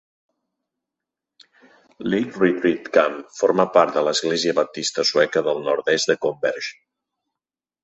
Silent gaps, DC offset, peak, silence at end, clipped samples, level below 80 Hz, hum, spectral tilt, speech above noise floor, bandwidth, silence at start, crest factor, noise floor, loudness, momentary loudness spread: none; under 0.1%; -2 dBFS; 1.1 s; under 0.1%; -66 dBFS; none; -3.5 dB/octave; 69 dB; 8.2 kHz; 2 s; 20 dB; -89 dBFS; -20 LUFS; 7 LU